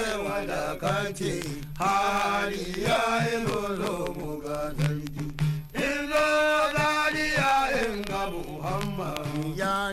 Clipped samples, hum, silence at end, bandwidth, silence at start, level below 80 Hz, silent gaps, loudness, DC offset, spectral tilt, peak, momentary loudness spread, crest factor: under 0.1%; none; 0 s; 16 kHz; 0 s; -44 dBFS; none; -27 LUFS; under 0.1%; -4.5 dB/octave; -14 dBFS; 9 LU; 12 dB